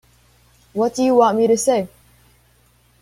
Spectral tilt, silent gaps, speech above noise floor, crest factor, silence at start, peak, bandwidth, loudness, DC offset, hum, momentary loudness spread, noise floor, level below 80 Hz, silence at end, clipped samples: -4.5 dB/octave; none; 40 dB; 18 dB; 0.75 s; -2 dBFS; 15.5 kHz; -17 LUFS; under 0.1%; 60 Hz at -45 dBFS; 13 LU; -56 dBFS; -58 dBFS; 1.15 s; under 0.1%